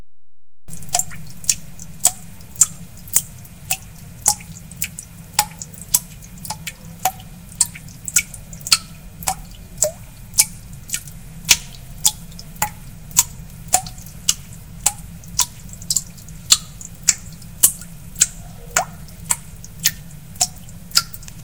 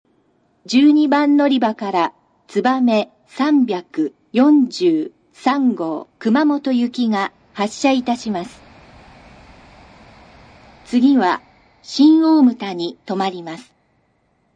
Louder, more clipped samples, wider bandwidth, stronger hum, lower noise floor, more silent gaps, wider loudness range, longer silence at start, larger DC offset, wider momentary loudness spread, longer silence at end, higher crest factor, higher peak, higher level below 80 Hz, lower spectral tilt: about the same, -19 LUFS vs -17 LUFS; neither; first, 19 kHz vs 9.4 kHz; neither; first, -71 dBFS vs -63 dBFS; neither; about the same, 4 LU vs 6 LU; second, 0 s vs 0.7 s; neither; first, 22 LU vs 13 LU; second, 0 s vs 0.95 s; first, 24 dB vs 16 dB; about the same, 0 dBFS vs -2 dBFS; first, -42 dBFS vs -60 dBFS; second, -0.5 dB/octave vs -5.5 dB/octave